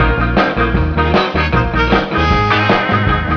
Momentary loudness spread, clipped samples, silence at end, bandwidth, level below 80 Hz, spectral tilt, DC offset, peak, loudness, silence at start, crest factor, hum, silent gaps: 2 LU; under 0.1%; 0 s; 5.4 kHz; -20 dBFS; -7 dB/octave; under 0.1%; 0 dBFS; -13 LUFS; 0 s; 12 dB; none; none